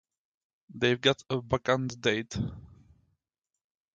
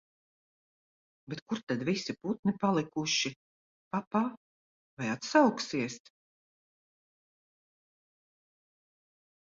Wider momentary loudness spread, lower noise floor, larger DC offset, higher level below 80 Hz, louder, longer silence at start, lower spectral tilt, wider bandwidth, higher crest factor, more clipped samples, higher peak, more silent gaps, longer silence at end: about the same, 11 LU vs 12 LU; about the same, -87 dBFS vs under -90 dBFS; neither; first, -54 dBFS vs -74 dBFS; first, -29 LUFS vs -32 LUFS; second, 0.75 s vs 1.3 s; about the same, -5 dB/octave vs -4.5 dB/octave; first, 9 kHz vs 7.8 kHz; about the same, 24 dB vs 26 dB; neither; about the same, -8 dBFS vs -10 dBFS; second, none vs 1.42-1.46 s, 1.63-1.67 s, 2.39-2.43 s, 3.36-3.91 s, 4.07-4.11 s, 4.37-4.97 s; second, 1.3 s vs 3.55 s